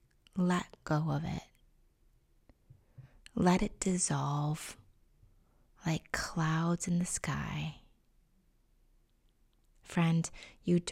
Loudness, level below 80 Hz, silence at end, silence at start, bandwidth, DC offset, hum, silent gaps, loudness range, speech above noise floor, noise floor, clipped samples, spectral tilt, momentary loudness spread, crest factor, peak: -34 LUFS; -56 dBFS; 0 s; 0.35 s; 14.5 kHz; under 0.1%; none; none; 4 LU; 37 dB; -69 dBFS; under 0.1%; -5.5 dB/octave; 11 LU; 20 dB; -14 dBFS